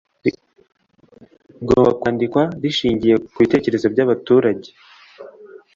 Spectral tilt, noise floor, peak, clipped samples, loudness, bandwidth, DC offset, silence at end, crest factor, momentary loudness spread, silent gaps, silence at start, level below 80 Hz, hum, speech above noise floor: -7 dB/octave; -50 dBFS; -2 dBFS; under 0.1%; -17 LUFS; 7.4 kHz; under 0.1%; 0.2 s; 18 dB; 9 LU; none; 0.25 s; -48 dBFS; none; 33 dB